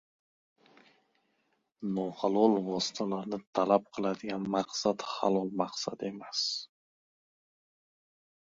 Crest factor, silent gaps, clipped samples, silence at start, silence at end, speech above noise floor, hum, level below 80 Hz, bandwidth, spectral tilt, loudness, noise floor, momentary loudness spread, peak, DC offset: 24 dB; 3.47-3.53 s; under 0.1%; 1.8 s; 1.8 s; 45 dB; none; -74 dBFS; 7.8 kHz; -4.5 dB/octave; -32 LUFS; -77 dBFS; 10 LU; -10 dBFS; under 0.1%